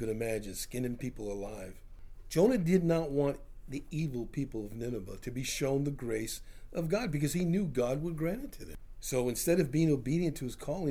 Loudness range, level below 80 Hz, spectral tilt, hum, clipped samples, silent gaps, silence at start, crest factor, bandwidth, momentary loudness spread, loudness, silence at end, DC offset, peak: 4 LU; -48 dBFS; -6 dB/octave; none; under 0.1%; none; 0 s; 20 dB; 18.5 kHz; 14 LU; -33 LUFS; 0 s; under 0.1%; -14 dBFS